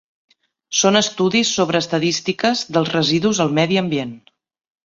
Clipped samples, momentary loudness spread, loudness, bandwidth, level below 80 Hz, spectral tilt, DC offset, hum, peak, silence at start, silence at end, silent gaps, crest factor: under 0.1%; 5 LU; -18 LUFS; 7.8 kHz; -58 dBFS; -3.5 dB/octave; under 0.1%; none; -2 dBFS; 0.7 s; 0.65 s; none; 18 dB